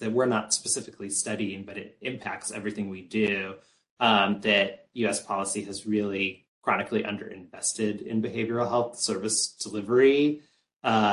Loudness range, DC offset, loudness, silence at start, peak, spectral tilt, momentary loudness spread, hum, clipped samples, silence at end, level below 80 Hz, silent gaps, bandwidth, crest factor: 4 LU; under 0.1%; -27 LUFS; 0 s; -8 dBFS; -3 dB/octave; 12 LU; none; under 0.1%; 0 s; -66 dBFS; 3.91-3.97 s, 6.48-6.62 s, 10.76-10.80 s; 11.5 kHz; 20 dB